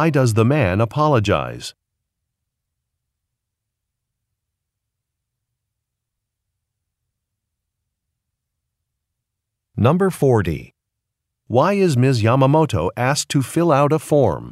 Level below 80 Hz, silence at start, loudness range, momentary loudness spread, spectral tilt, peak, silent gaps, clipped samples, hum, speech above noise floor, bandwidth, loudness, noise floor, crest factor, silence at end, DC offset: -48 dBFS; 0 s; 8 LU; 7 LU; -6.5 dB/octave; -2 dBFS; none; under 0.1%; none; 64 dB; 15 kHz; -17 LUFS; -80 dBFS; 18 dB; 0 s; under 0.1%